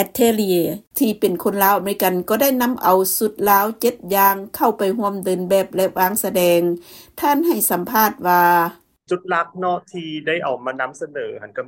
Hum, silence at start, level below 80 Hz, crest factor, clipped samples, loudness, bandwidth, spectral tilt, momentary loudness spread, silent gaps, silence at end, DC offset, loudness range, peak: none; 0 s; -58 dBFS; 18 dB; under 0.1%; -18 LUFS; 16.5 kHz; -4 dB/octave; 10 LU; 0.87-0.91 s; 0 s; under 0.1%; 2 LU; 0 dBFS